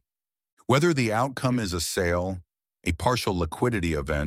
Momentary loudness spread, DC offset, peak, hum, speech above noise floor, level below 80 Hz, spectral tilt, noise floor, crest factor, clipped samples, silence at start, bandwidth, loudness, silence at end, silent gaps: 10 LU; under 0.1%; -8 dBFS; none; over 65 dB; -42 dBFS; -5 dB/octave; under -90 dBFS; 20 dB; under 0.1%; 0.7 s; 16.5 kHz; -26 LUFS; 0 s; none